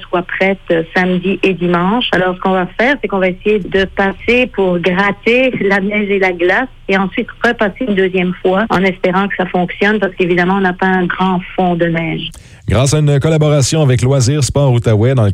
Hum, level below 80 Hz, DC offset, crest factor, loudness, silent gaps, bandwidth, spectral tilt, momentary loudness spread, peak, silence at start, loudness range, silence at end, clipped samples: none; -36 dBFS; under 0.1%; 12 dB; -13 LUFS; none; 13.5 kHz; -5.5 dB/octave; 4 LU; -2 dBFS; 0 s; 1 LU; 0 s; under 0.1%